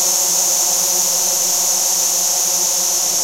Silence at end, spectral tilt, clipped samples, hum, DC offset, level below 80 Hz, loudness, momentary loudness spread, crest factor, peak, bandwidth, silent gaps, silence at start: 0 s; 1.5 dB/octave; under 0.1%; none; 0.3%; -68 dBFS; -13 LUFS; 1 LU; 14 dB; -4 dBFS; 16 kHz; none; 0 s